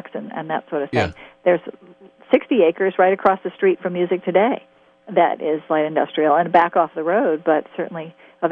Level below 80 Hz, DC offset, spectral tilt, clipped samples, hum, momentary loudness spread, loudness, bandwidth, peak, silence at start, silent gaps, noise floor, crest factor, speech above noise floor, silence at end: -62 dBFS; under 0.1%; -7.5 dB/octave; under 0.1%; none; 12 LU; -19 LUFS; 7.4 kHz; -2 dBFS; 0.05 s; none; -44 dBFS; 18 dB; 25 dB; 0 s